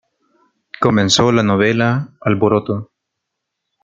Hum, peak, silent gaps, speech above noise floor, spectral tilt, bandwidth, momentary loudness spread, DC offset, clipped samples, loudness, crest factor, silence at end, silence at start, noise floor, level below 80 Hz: none; 0 dBFS; none; 63 dB; -5 dB/octave; 9.2 kHz; 8 LU; under 0.1%; under 0.1%; -15 LUFS; 16 dB; 1 s; 0.8 s; -77 dBFS; -52 dBFS